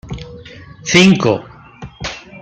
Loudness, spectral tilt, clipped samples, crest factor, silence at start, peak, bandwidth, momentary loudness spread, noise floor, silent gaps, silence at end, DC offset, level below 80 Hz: -12 LUFS; -4.5 dB/octave; under 0.1%; 16 dB; 0.05 s; 0 dBFS; 8.6 kHz; 26 LU; -36 dBFS; none; 0.05 s; under 0.1%; -42 dBFS